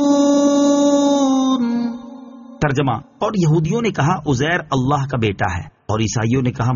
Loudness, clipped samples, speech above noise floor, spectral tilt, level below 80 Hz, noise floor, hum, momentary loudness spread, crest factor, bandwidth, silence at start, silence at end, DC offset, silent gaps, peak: -17 LUFS; under 0.1%; 19 dB; -6 dB/octave; -44 dBFS; -36 dBFS; none; 9 LU; 14 dB; 7.4 kHz; 0 s; 0 s; under 0.1%; none; -4 dBFS